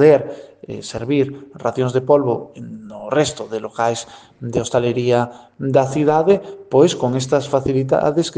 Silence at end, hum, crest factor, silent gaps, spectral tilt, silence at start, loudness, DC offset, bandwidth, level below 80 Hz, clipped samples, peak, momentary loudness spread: 0.05 s; none; 18 dB; none; -6 dB/octave; 0 s; -18 LUFS; under 0.1%; 9.8 kHz; -52 dBFS; under 0.1%; 0 dBFS; 17 LU